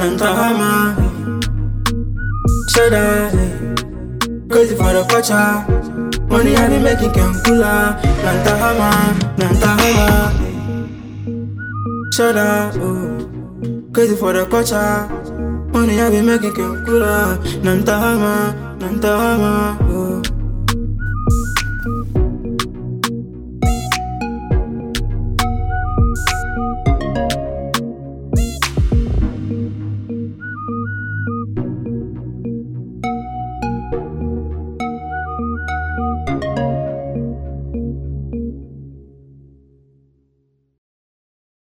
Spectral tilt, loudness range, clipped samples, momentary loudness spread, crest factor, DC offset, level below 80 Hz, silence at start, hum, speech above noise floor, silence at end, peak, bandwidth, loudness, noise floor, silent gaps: -5.5 dB/octave; 10 LU; under 0.1%; 12 LU; 16 dB; under 0.1%; -24 dBFS; 0 s; none; 49 dB; 2.55 s; -2 dBFS; over 20 kHz; -17 LUFS; -62 dBFS; none